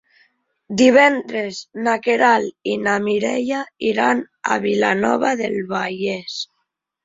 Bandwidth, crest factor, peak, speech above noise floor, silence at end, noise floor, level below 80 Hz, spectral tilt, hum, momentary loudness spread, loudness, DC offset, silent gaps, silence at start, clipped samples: 7.8 kHz; 18 dB; -2 dBFS; 56 dB; 0.6 s; -74 dBFS; -62 dBFS; -4.5 dB/octave; none; 12 LU; -18 LUFS; under 0.1%; none; 0.7 s; under 0.1%